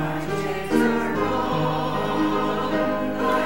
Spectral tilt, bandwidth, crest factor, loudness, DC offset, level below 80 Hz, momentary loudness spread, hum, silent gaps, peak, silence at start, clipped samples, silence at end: -6 dB/octave; 16.5 kHz; 16 dB; -23 LUFS; 1%; -46 dBFS; 5 LU; none; none; -8 dBFS; 0 s; under 0.1%; 0 s